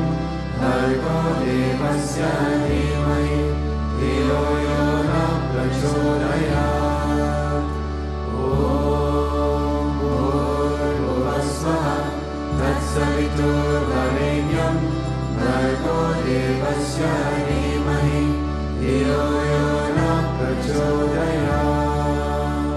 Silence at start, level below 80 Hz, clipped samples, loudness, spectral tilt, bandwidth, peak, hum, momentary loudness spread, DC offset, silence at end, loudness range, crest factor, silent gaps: 0 s; -28 dBFS; under 0.1%; -21 LUFS; -6.5 dB/octave; 12.5 kHz; -6 dBFS; none; 4 LU; under 0.1%; 0 s; 1 LU; 14 dB; none